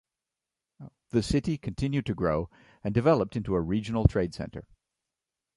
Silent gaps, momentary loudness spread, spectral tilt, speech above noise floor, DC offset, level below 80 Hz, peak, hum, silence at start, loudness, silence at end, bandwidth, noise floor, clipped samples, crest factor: none; 13 LU; -7.5 dB/octave; 61 dB; under 0.1%; -42 dBFS; -6 dBFS; none; 0.8 s; -28 LUFS; 0.95 s; 11.5 kHz; -89 dBFS; under 0.1%; 24 dB